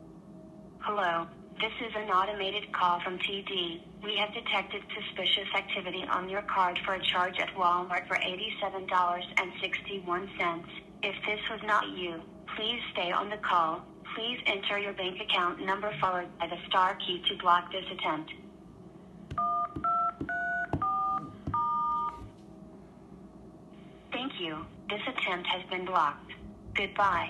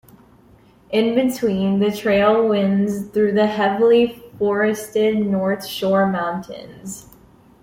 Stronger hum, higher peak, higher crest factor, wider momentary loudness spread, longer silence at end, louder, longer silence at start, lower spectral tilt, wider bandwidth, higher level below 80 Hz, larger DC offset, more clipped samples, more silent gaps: neither; second, -10 dBFS vs -4 dBFS; first, 22 dB vs 14 dB; first, 19 LU vs 13 LU; second, 0 s vs 0.6 s; second, -31 LUFS vs -18 LUFS; second, 0 s vs 0.9 s; second, -4.5 dB/octave vs -6 dB/octave; second, 12 kHz vs 16.5 kHz; second, -60 dBFS vs -54 dBFS; neither; neither; neither